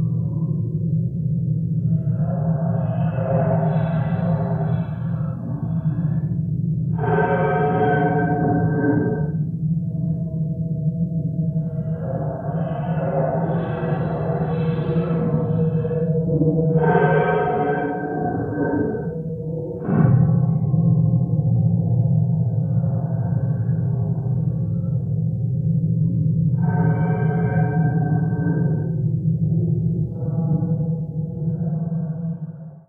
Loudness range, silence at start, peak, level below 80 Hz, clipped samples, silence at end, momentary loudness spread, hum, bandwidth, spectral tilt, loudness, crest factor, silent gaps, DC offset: 4 LU; 0 s; -4 dBFS; -44 dBFS; under 0.1%; 0.1 s; 7 LU; none; 3.5 kHz; -12.5 dB/octave; -21 LUFS; 16 dB; none; under 0.1%